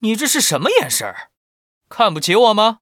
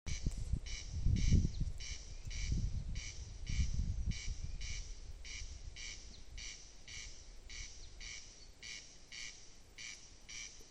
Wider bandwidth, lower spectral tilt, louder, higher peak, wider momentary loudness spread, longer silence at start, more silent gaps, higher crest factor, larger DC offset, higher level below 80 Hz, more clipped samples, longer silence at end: first, over 20 kHz vs 10 kHz; second, -2.5 dB/octave vs -4 dB/octave; first, -15 LUFS vs -44 LUFS; first, 0 dBFS vs -20 dBFS; first, 16 LU vs 13 LU; about the same, 0 s vs 0.05 s; first, 1.37-1.81 s vs none; second, 16 dB vs 22 dB; neither; second, -68 dBFS vs -42 dBFS; neither; about the same, 0.05 s vs 0 s